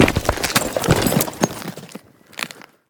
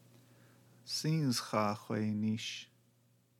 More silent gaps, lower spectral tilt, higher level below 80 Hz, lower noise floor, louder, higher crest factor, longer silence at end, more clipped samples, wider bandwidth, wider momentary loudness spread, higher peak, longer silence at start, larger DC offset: neither; about the same, -4 dB/octave vs -5 dB/octave; first, -36 dBFS vs -84 dBFS; second, -41 dBFS vs -71 dBFS; first, -20 LUFS vs -36 LUFS; about the same, 20 dB vs 20 dB; second, 0.3 s vs 0.75 s; neither; first, over 20 kHz vs 16.5 kHz; first, 20 LU vs 13 LU; first, 0 dBFS vs -18 dBFS; second, 0 s vs 0.85 s; neither